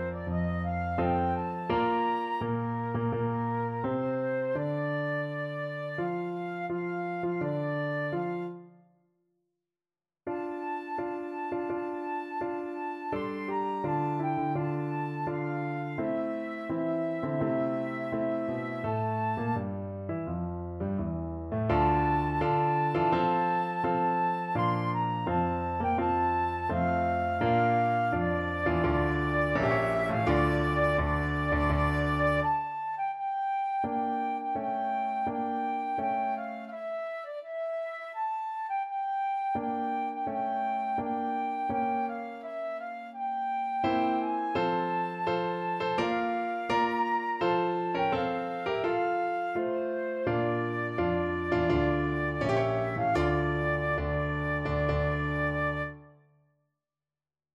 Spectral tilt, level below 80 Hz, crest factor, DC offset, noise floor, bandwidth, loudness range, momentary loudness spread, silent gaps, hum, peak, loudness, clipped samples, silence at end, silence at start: -8 dB/octave; -46 dBFS; 16 dB; under 0.1%; under -90 dBFS; 11.5 kHz; 7 LU; 8 LU; none; none; -14 dBFS; -30 LUFS; under 0.1%; 1.45 s; 0 s